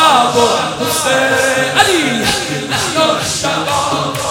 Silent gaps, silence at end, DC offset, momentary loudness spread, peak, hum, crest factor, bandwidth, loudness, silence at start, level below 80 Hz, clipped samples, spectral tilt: none; 0 s; under 0.1%; 5 LU; 0 dBFS; none; 14 dB; 18.5 kHz; -13 LUFS; 0 s; -46 dBFS; under 0.1%; -2.5 dB/octave